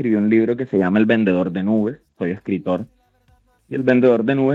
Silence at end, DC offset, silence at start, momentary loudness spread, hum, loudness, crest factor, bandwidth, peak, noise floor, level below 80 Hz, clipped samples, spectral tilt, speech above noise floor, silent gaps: 0 s; under 0.1%; 0 s; 11 LU; none; -18 LUFS; 16 dB; 5 kHz; -4 dBFS; -58 dBFS; -60 dBFS; under 0.1%; -9 dB/octave; 40 dB; none